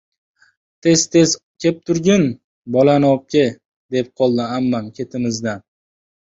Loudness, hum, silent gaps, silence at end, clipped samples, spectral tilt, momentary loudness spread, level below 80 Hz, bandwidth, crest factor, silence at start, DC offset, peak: -17 LUFS; none; 1.43-1.55 s, 2.44-2.64 s, 3.66-3.89 s; 0.8 s; under 0.1%; -5 dB/octave; 11 LU; -56 dBFS; 8 kHz; 16 dB; 0.85 s; under 0.1%; -2 dBFS